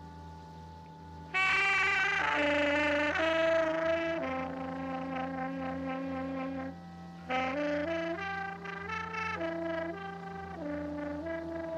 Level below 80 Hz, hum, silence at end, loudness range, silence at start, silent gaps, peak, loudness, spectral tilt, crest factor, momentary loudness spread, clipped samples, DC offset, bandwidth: -60 dBFS; none; 0 s; 9 LU; 0 s; none; -18 dBFS; -32 LUFS; -5 dB/octave; 14 dB; 20 LU; under 0.1%; under 0.1%; 11 kHz